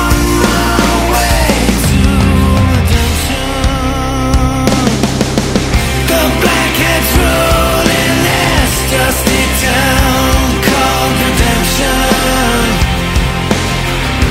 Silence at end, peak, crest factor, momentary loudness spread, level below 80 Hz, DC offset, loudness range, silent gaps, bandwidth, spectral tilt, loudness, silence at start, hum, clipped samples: 0 s; 0 dBFS; 10 dB; 4 LU; -16 dBFS; under 0.1%; 2 LU; none; 16.5 kHz; -4.5 dB/octave; -11 LUFS; 0 s; none; under 0.1%